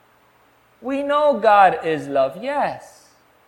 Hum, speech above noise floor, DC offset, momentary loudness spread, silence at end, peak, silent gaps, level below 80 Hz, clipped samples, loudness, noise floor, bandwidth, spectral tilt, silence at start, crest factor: none; 38 dB; under 0.1%; 13 LU; 0.6 s; 0 dBFS; none; -62 dBFS; under 0.1%; -18 LUFS; -56 dBFS; 16.5 kHz; -5.5 dB/octave; 0.8 s; 20 dB